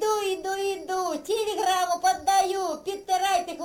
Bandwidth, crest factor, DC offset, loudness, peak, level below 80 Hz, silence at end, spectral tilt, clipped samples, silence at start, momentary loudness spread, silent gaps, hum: 17 kHz; 14 dB; under 0.1%; -26 LUFS; -12 dBFS; -62 dBFS; 0 s; -1 dB/octave; under 0.1%; 0 s; 6 LU; none; none